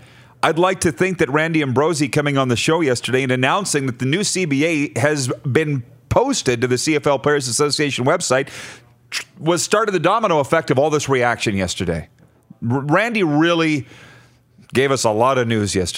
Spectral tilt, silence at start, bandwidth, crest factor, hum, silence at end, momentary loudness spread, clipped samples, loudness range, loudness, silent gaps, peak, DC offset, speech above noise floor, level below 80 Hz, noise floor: -4.5 dB/octave; 0.45 s; 16 kHz; 18 dB; none; 0 s; 7 LU; under 0.1%; 1 LU; -18 LUFS; none; 0 dBFS; under 0.1%; 32 dB; -50 dBFS; -50 dBFS